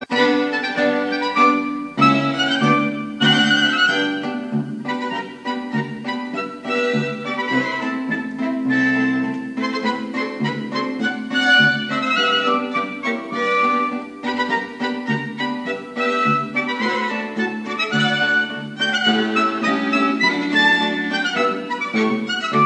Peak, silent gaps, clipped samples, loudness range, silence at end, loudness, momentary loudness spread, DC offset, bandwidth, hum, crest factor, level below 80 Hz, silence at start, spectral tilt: -2 dBFS; none; under 0.1%; 5 LU; 0 s; -19 LUFS; 10 LU; under 0.1%; 10 kHz; none; 18 dB; -66 dBFS; 0 s; -4.5 dB/octave